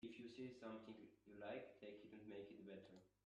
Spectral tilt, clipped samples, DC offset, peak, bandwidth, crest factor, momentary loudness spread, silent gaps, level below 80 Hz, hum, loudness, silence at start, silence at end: -6.5 dB/octave; under 0.1%; under 0.1%; -40 dBFS; 9.6 kHz; 18 dB; 8 LU; none; -88 dBFS; none; -58 LUFS; 0 s; 0.2 s